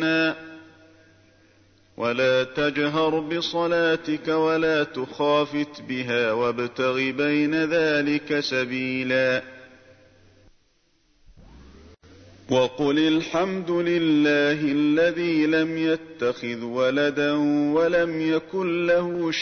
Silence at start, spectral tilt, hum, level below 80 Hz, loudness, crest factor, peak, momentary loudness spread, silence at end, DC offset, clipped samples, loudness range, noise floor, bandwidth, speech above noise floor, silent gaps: 0 s; -5.5 dB/octave; none; -60 dBFS; -23 LUFS; 14 dB; -10 dBFS; 6 LU; 0 s; under 0.1%; under 0.1%; 6 LU; -64 dBFS; 6.6 kHz; 42 dB; none